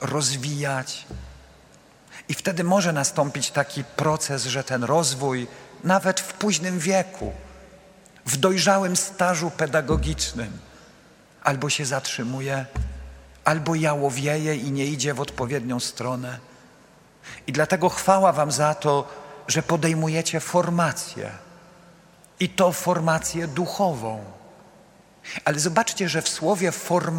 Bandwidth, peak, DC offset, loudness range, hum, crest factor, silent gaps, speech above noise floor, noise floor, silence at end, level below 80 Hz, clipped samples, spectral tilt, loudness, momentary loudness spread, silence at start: 16.5 kHz; 0 dBFS; under 0.1%; 4 LU; none; 24 dB; none; 29 dB; -53 dBFS; 0 s; -44 dBFS; under 0.1%; -4 dB/octave; -23 LUFS; 14 LU; 0 s